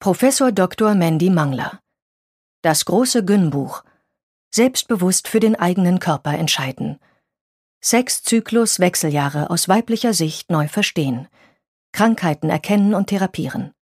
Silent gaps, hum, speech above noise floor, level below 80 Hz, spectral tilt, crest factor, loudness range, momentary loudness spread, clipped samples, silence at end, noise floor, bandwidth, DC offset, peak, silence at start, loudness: 2.02-2.63 s, 4.23-4.51 s, 7.41-7.81 s, 11.68-11.93 s; none; over 73 dB; -60 dBFS; -4.5 dB/octave; 18 dB; 2 LU; 9 LU; under 0.1%; 0.15 s; under -90 dBFS; 15.5 kHz; under 0.1%; 0 dBFS; 0 s; -18 LUFS